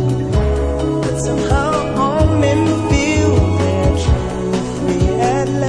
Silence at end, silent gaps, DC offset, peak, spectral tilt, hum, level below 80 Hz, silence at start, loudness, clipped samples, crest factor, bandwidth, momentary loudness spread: 0 s; none; under 0.1%; -2 dBFS; -6.5 dB/octave; none; -22 dBFS; 0 s; -16 LUFS; under 0.1%; 12 dB; 11 kHz; 4 LU